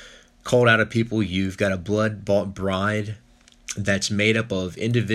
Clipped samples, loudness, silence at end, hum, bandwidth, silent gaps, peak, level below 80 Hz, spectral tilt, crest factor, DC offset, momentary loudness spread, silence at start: under 0.1%; -22 LUFS; 0 s; none; 13 kHz; none; -4 dBFS; -54 dBFS; -5 dB/octave; 18 dB; under 0.1%; 13 LU; 0 s